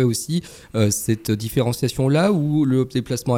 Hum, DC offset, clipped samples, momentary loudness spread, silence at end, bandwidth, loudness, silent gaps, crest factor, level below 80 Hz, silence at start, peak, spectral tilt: none; under 0.1%; under 0.1%; 6 LU; 0 s; 17 kHz; -21 LUFS; none; 14 dB; -48 dBFS; 0 s; -6 dBFS; -6 dB/octave